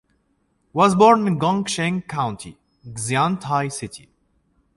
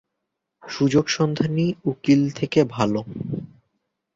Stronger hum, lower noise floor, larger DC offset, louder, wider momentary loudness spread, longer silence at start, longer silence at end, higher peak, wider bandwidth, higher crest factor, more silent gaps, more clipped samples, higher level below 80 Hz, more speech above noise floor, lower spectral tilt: neither; second, -67 dBFS vs -80 dBFS; neither; about the same, -20 LUFS vs -22 LUFS; first, 20 LU vs 11 LU; about the same, 0.75 s vs 0.65 s; about the same, 0.8 s vs 0.7 s; about the same, -2 dBFS vs -4 dBFS; first, 11.5 kHz vs 7.8 kHz; about the same, 20 dB vs 18 dB; neither; neither; about the same, -56 dBFS vs -56 dBFS; second, 47 dB vs 59 dB; about the same, -5 dB/octave vs -6 dB/octave